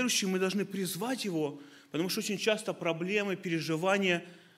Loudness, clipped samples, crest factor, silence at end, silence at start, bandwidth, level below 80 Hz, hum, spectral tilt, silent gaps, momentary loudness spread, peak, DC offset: -32 LUFS; under 0.1%; 18 dB; 0.2 s; 0 s; 16 kHz; -80 dBFS; none; -4 dB/octave; none; 7 LU; -14 dBFS; under 0.1%